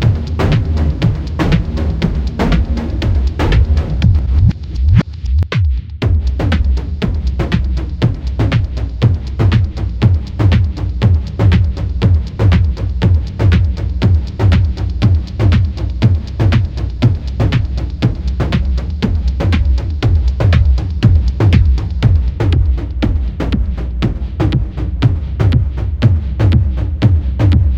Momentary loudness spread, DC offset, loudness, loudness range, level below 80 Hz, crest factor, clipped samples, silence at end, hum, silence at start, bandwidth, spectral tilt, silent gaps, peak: 5 LU; under 0.1%; -15 LUFS; 3 LU; -16 dBFS; 12 dB; under 0.1%; 0 s; none; 0 s; 7.2 kHz; -8 dB/octave; none; 0 dBFS